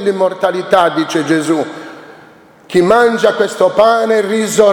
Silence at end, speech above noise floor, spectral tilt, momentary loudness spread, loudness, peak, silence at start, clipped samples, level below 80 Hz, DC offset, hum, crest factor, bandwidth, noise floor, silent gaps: 0 s; 30 dB; -4.5 dB/octave; 7 LU; -12 LUFS; 0 dBFS; 0 s; under 0.1%; -54 dBFS; under 0.1%; none; 12 dB; 18 kHz; -41 dBFS; none